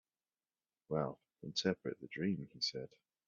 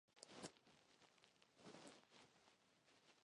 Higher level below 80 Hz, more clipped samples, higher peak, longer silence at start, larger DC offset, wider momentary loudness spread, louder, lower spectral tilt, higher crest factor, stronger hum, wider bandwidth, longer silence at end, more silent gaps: first, -76 dBFS vs under -90 dBFS; neither; first, -20 dBFS vs -36 dBFS; first, 0.9 s vs 0.1 s; neither; about the same, 11 LU vs 9 LU; first, -40 LUFS vs -63 LUFS; about the same, -4 dB/octave vs -3 dB/octave; second, 22 dB vs 32 dB; neither; second, 7.4 kHz vs 11 kHz; first, 0.4 s vs 0 s; neither